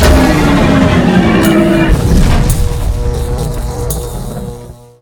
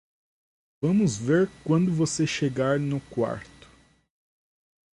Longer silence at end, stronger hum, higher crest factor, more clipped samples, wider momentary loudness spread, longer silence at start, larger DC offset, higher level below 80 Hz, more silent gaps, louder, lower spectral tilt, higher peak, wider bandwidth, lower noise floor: second, 0.3 s vs 1.5 s; neither; second, 10 dB vs 16 dB; first, 0.4% vs under 0.1%; first, 13 LU vs 7 LU; second, 0 s vs 0.8 s; neither; first, -16 dBFS vs -58 dBFS; neither; first, -11 LUFS vs -25 LUFS; about the same, -6 dB/octave vs -6 dB/octave; first, 0 dBFS vs -12 dBFS; first, over 20 kHz vs 11.5 kHz; second, -30 dBFS vs -57 dBFS